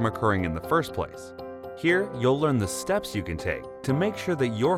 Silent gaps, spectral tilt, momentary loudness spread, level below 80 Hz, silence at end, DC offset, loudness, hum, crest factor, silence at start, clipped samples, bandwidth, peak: none; -6 dB/octave; 11 LU; -52 dBFS; 0 s; under 0.1%; -26 LUFS; none; 16 dB; 0 s; under 0.1%; 16.5 kHz; -10 dBFS